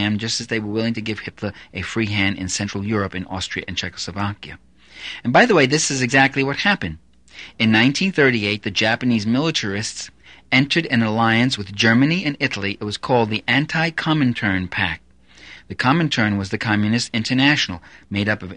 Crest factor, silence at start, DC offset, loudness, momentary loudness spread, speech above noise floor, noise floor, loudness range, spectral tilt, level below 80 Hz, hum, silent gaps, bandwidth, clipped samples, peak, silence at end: 20 dB; 0 s; 0.2%; -19 LUFS; 12 LU; 25 dB; -45 dBFS; 6 LU; -4.5 dB/octave; -50 dBFS; none; none; 10 kHz; under 0.1%; 0 dBFS; 0 s